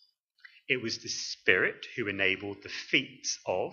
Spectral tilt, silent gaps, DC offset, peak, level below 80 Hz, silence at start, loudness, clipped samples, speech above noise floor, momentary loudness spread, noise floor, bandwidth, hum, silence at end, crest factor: -2.5 dB/octave; none; under 0.1%; -6 dBFS; -74 dBFS; 0.7 s; -30 LUFS; under 0.1%; 28 dB; 10 LU; -59 dBFS; 7.6 kHz; none; 0 s; 28 dB